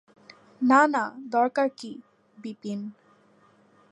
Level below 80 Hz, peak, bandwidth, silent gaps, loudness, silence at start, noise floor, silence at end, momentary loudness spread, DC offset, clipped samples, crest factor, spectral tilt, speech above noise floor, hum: -84 dBFS; -6 dBFS; 10 kHz; none; -24 LUFS; 0.6 s; -60 dBFS; 1 s; 22 LU; under 0.1%; under 0.1%; 22 dB; -5 dB/octave; 35 dB; none